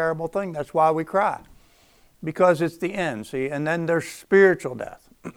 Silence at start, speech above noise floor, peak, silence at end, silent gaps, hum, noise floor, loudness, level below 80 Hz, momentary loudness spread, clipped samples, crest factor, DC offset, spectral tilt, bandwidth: 0 s; 34 dB; -4 dBFS; 0.05 s; none; none; -57 dBFS; -22 LUFS; -58 dBFS; 17 LU; under 0.1%; 18 dB; under 0.1%; -6.5 dB/octave; 15 kHz